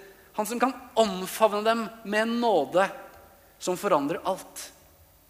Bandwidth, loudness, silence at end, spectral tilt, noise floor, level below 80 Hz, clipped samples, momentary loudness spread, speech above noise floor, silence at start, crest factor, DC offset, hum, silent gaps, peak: 15.5 kHz; -26 LUFS; 0.6 s; -4 dB/octave; -57 dBFS; -64 dBFS; under 0.1%; 13 LU; 31 dB; 0 s; 20 dB; under 0.1%; none; none; -6 dBFS